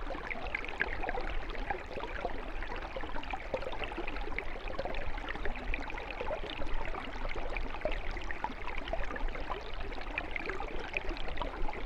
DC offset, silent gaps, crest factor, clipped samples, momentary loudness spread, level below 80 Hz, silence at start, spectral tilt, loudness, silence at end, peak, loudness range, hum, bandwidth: under 0.1%; none; 20 dB; under 0.1%; 4 LU; -40 dBFS; 0 s; -5.5 dB/octave; -39 LUFS; 0 s; -16 dBFS; 1 LU; none; 7.2 kHz